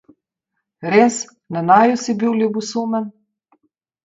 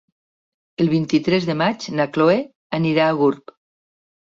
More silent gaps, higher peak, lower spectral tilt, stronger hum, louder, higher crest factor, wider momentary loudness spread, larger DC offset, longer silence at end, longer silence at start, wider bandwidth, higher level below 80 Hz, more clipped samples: second, none vs 2.55-2.70 s; first, 0 dBFS vs -4 dBFS; second, -5 dB/octave vs -6.5 dB/octave; neither; about the same, -17 LUFS vs -19 LUFS; about the same, 18 dB vs 16 dB; first, 14 LU vs 6 LU; neither; about the same, 0.95 s vs 1 s; about the same, 0.8 s vs 0.8 s; about the same, 7.8 kHz vs 7.6 kHz; second, -68 dBFS vs -60 dBFS; neither